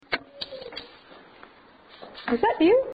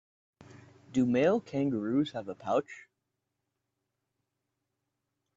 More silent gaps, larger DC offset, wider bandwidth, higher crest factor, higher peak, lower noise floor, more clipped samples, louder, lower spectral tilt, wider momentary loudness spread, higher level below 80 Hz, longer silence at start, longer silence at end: neither; neither; second, 5 kHz vs 7.8 kHz; about the same, 18 dB vs 20 dB; first, -10 dBFS vs -14 dBFS; second, -52 dBFS vs -84 dBFS; neither; first, -25 LUFS vs -30 LUFS; about the same, -7 dB/octave vs -7 dB/octave; first, 26 LU vs 12 LU; first, -60 dBFS vs -70 dBFS; second, 0.1 s vs 0.9 s; second, 0 s vs 2.55 s